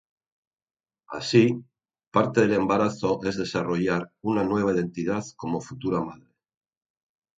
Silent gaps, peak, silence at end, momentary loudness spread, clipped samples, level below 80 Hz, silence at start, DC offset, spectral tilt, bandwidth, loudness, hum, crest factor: 2.07-2.11 s; -6 dBFS; 1.25 s; 10 LU; under 0.1%; -58 dBFS; 1.1 s; under 0.1%; -6.5 dB/octave; 9 kHz; -25 LUFS; none; 22 dB